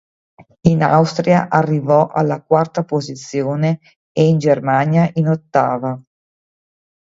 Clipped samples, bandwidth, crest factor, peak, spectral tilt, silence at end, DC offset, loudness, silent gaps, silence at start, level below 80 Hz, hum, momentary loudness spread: under 0.1%; 7.8 kHz; 16 dB; 0 dBFS; -7.5 dB/octave; 1.05 s; under 0.1%; -16 LUFS; 3.96-4.15 s; 0.65 s; -50 dBFS; none; 9 LU